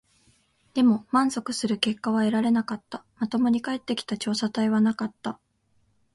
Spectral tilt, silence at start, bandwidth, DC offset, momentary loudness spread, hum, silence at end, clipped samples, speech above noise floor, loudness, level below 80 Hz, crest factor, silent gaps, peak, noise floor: -5 dB/octave; 0.75 s; 11.5 kHz; under 0.1%; 11 LU; none; 0.8 s; under 0.1%; 43 dB; -25 LUFS; -66 dBFS; 20 dB; none; -6 dBFS; -68 dBFS